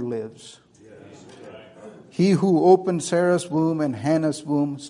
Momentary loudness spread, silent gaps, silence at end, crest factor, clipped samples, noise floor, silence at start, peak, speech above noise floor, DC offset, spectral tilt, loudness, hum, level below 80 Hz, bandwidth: 20 LU; none; 0 s; 20 dB; under 0.1%; -46 dBFS; 0 s; -4 dBFS; 26 dB; under 0.1%; -6.5 dB/octave; -21 LUFS; none; -66 dBFS; 11 kHz